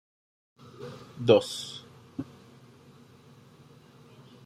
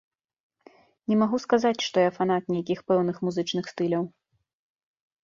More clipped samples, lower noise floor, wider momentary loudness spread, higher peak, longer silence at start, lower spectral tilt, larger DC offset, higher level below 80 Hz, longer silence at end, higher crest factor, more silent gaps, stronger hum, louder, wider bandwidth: neither; about the same, -55 dBFS vs -56 dBFS; first, 22 LU vs 6 LU; about the same, -6 dBFS vs -8 dBFS; second, 0.8 s vs 1.1 s; about the same, -5.5 dB/octave vs -6 dB/octave; neither; about the same, -72 dBFS vs -70 dBFS; first, 2.25 s vs 1.15 s; first, 26 dB vs 20 dB; neither; neither; about the same, -27 LUFS vs -26 LUFS; first, 14 kHz vs 7.6 kHz